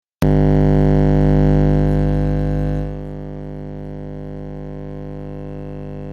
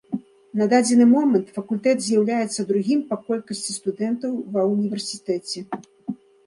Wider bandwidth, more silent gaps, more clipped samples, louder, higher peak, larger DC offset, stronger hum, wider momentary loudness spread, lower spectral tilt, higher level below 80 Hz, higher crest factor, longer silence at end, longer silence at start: second, 6.4 kHz vs 11.5 kHz; neither; neither; first, -16 LUFS vs -22 LUFS; about the same, -2 dBFS vs -4 dBFS; neither; first, 50 Hz at -20 dBFS vs none; about the same, 16 LU vs 17 LU; first, -10 dB/octave vs -5 dB/octave; first, -24 dBFS vs -70 dBFS; about the same, 16 dB vs 18 dB; second, 0 s vs 0.3 s; about the same, 0.2 s vs 0.1 s